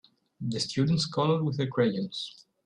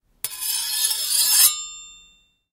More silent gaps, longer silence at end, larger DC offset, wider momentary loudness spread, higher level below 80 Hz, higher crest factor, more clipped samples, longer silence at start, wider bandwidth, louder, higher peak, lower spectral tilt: neither; second, 0.35 s vs 0.55 s; neither; second, 11 LU vs 18 LU; about the same, -64 dBFS vs -62 dBFS; about the same, 18 dB vs 22 dB; neither; first, 0.4 s vs 0.25 s; second, 10.5 kHz vs 16 kHz; second, -29 LUFS vs -18 LUFS; second, -12 dBFS vs -2 dBFS; first, -6 dB/octave vs 4.5 dB/octave